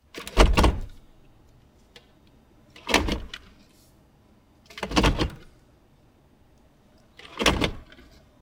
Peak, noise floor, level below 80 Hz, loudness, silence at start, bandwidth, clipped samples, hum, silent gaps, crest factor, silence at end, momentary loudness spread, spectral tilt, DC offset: -2 dBFS; -58 dBFS; -32 dBFS; -24 LUFS; 0.15 s; 18 kHz; under 0.1%; none; none; 26 dB; 0.6 s; 24 LU; -4.5 dB/octave; under 0.1%